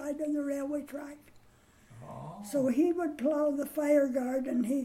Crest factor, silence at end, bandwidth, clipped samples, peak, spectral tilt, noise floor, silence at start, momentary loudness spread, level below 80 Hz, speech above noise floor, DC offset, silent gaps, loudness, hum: 16 dB; 0 s; 16.5 kHz; under 0.1%; -16 dBFS; -6.5 dB/octave; -61 dBFS; 0 s; 18 LU; -68 dBFS; 30 dB; under 0.1%; none; -31 LUFS; none